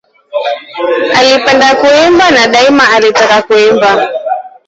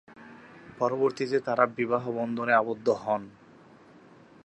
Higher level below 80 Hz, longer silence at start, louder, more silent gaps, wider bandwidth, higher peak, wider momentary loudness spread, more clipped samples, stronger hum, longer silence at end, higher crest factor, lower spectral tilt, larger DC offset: first, -46 dBFS vs -72 dBFS; first, 0.35 s vs 0.1 s; first, -7 LUFS vs -27 LUFS; neither; about the same, 8.2 kHz vs 8.6 kHz; first, 0 dBFS vs -6 dBFS; second, 11 LU vs 24 LU; neither; neither; second, 0.2 s vs 1.15 s; second, 8 dB vs 24 dB; second, -3 dB/octave vs -6.5 dB/octave; neither